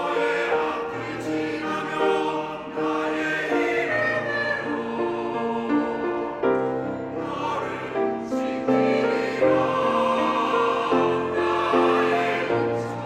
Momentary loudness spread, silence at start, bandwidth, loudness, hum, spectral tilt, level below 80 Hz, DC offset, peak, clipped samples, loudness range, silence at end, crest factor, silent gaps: 7 LU; 0 s; 12.5 kHz; -24 LUFS; none; -5.5 dB/octave; -60 dBFS; under 0.1%; -6 dBFS; under 0.1%; 4 LU; 0 s; 16 dB; none